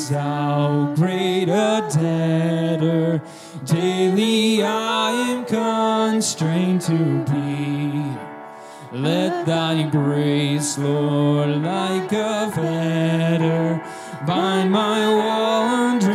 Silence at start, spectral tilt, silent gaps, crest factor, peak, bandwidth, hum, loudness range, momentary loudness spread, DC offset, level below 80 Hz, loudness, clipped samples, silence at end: 0 s; -5.5 dB/octave; none; 14 dB; -6 dBFS; 14.5 kHz; none; 3 LU; 6 LU; under 0.1%; -66 dBFS; -20 LUFS; under 0.1%; 0 s